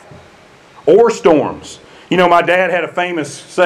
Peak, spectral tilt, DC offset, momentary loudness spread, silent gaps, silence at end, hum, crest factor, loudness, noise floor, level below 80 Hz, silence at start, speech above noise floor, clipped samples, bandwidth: 0 dBFS; -5 dB/octave; under 0.1%; 12 LU; none; 0 s; none; 14 dB; -13 LUFS; -43 dBFS; -52 dBFS; 0.85 s; 30 dB; under 0.1%; 12.5 kHz